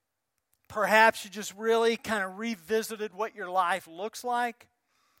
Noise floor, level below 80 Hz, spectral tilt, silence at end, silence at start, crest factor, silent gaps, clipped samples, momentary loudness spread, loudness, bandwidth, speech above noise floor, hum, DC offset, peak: -83 dBFS; -74 dBFS; -3 dB/octave; 0.7 s; 0.7 s; 22 dB; none; under 0.1%; 15 LU; -28 LUFS; 16.5 kHz; 54 dB; none; under 0.1%; -6 dBFS